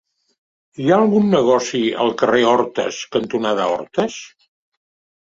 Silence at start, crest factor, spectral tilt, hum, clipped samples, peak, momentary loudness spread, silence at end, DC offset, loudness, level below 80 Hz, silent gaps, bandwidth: 0.8 s; 16 dB; -5 dB/octave; none; under 0.1%; -2 dBFS; 9 LU; 1 s; under 0.1%; -17 LUFS; -60 dBFS; none; 7.8 kHz